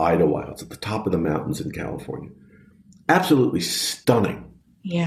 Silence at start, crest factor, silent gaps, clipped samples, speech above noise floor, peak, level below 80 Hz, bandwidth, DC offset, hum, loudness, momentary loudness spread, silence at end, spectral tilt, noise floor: 0 s; 20 dB; none; under 0.1%; 29 dB; -4 dBFS; -50 dBFS; 15 kHz; under 0.1%; none; -23 LUFS; 17 LU; 0 s; -5 dB/octave; -51 dBFS